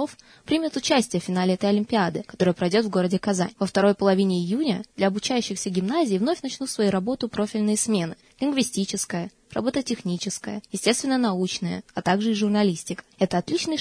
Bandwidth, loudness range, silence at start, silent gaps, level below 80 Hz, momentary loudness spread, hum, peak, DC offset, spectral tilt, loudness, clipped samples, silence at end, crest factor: 11 kHz; 3 LU; 0 s; none; -60 dBFS; 7 LU; none; -6 dBFS; under 0.1%; -5 dB/octave; -24 LUFS; under 0.1%; 0 s; 18 dB